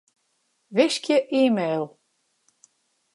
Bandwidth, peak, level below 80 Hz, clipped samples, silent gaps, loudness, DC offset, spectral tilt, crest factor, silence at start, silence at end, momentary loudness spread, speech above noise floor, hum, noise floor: 11.5 kHz; -6 dBFS; -80 dBFS; under 0.1%; none; -22 LUFS; under 0.1%; -4.5 dB/octave; 20 dB; 0.7 s; 1.25 s; 9 LU; 50 dB; none; -71 dBFS